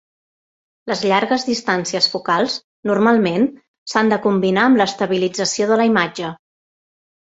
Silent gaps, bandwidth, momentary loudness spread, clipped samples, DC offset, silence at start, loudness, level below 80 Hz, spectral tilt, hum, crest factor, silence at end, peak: 2.64-2.83 s, 3.68-3.86 s; 8 kHz; 9 LU; under 0.1%; under 0.1%; 0.85 s; -17 LUFS; -62 dBFS; -4 dB/octave; none; 18 dB; 0.85 s; 0 dBFS